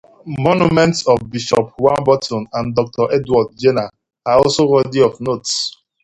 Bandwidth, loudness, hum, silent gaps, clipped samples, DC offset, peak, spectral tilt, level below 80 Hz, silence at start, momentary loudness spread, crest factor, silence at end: 11 kHz; -16 LUFS; none; none; under 0.1%; under 0.1%; 0 dBFS; -5 dB/octave; -48 dBFS; 0.25 s; 9 LU; 16 dB; 0.35 s